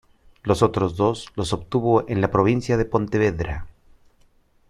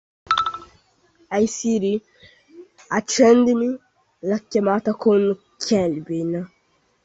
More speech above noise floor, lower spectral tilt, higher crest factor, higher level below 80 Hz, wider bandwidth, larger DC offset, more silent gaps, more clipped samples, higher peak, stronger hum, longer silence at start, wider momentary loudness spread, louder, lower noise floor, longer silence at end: second, 37 dB vs 45 dB; first, -7 dB/octave vs -5 dB/octave; about the same, 20 dB vs 18 dB; first, -42 dBFS vs -60 dBFS; first, 12.5 kHz vs 8.2 kHz; neither; neither; neither; about the same, -4 dBFS vs -4 dBFS; neither; first, 0.45 s vs 0.3 s; second, 9 LU vs 12 LU; about the same, -22 LUFS vs -21 LUFS; second, -58 dBFS vs -64 dBFS; first, 1 s vs 0.6 s